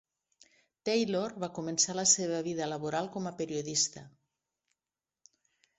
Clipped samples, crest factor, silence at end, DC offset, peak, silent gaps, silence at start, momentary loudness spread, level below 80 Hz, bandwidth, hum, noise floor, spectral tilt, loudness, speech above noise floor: under 0.1%; 24 dB; 1.7 s; under 0.1%; -10 dBFS; none; 0.85 s; 12 LU; -74 dBFS; 8.2 kHz; none; under -90 dBFS; -2.5 dB/octave; -31 LUFS; over 58 dB